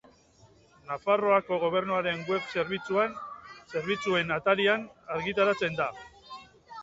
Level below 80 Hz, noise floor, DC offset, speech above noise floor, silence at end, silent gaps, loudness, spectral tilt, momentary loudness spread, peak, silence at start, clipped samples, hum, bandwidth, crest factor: -64 dBFS; -59 dBFS; under 0.1%; 31 dB; 0 s; none; -28 LUFS; -5.5 dB/octave; 21 LU; -10 dBFS; 0.85 s; under 0.1%; none; 7.8 kHz; 20 dB